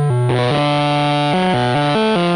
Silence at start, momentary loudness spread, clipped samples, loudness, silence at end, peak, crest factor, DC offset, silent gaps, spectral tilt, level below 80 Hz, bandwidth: 0 s; 1 LU; under 0.1%; -15 LUFS; 0 s; -6 dBFS; 8 dB; under 0.1%; none; -6.5 dB/octave; -48 dBFS; 9.6 kHz